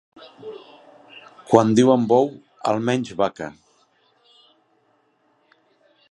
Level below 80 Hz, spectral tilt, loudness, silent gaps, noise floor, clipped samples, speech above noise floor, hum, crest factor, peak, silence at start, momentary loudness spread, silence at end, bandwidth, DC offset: -64 dBFS; -6.5 dB/octave; -19 LUFS; none; -64 dBFS; under 0.1%; 45 dB; none; 22 dB; 0 dBFS; 0.45 s; 23 LU; 2.6 s; 11 kHz; under 0.1%